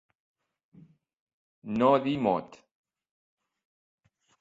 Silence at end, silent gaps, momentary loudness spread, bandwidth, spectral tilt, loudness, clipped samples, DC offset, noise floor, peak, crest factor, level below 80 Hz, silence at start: 1.85 s; none; 11 LU; 7.8 kHz; -8 dB/octave; -27 LUFS; under 0.1%; under 0.1%; -58 dBFS; -10 dBFS; 22 dB; -68 dBFS; 1.65 s